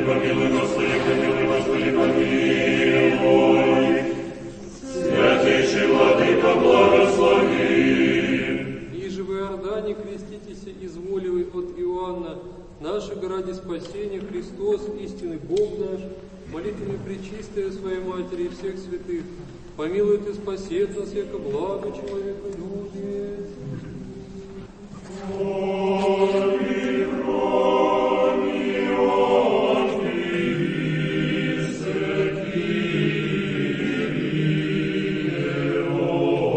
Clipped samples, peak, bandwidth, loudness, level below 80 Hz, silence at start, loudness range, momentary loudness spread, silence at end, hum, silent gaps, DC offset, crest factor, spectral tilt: under 0.1%; -4 dBFS; 8.8 kHz; -22 LUFS; -48 dBFS; 0 s; 12 LU; 17 LU; 0 s; none; none; under 0.1%; 18 dB; -6 dB/octave